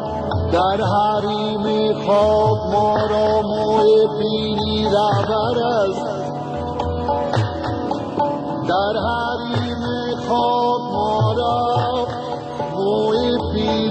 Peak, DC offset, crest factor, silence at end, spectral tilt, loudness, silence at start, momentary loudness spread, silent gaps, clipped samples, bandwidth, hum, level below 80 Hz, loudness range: -6 dBFS; under 0.1%; 14 dB; 0 s; -7 dB/octave; -19 LUFS; 0 s; 8 LU; none; under 0.1%; 8.8 kHz; none; -40 dBFS; 4 LU